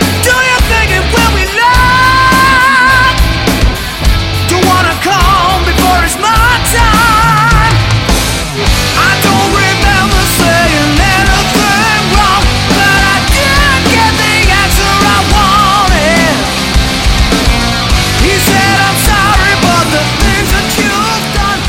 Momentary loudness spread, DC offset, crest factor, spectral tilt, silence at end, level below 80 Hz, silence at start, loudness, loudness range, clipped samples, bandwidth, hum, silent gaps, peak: 4 LU; under 0.1%; 8 dB; -3.5 dB/octave; 0 s; -16 dBFS; 0 s; -8 LUFS; 2 LU; 0.1%; 17 kHz; none; none; 0 dBFS